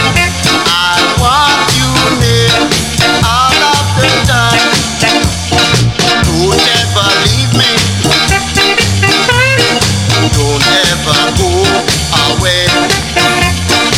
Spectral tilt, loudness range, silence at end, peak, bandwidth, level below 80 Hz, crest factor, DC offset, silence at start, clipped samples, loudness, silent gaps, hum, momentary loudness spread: -3.5 dB/octave; 1 LU; 0 s; 0 dBFS; 16.5 kHz; -24 dBFS; 10 dB; under 0.1%; 0 s; under 0.1%; -8 LUFS; none; none; 2 LU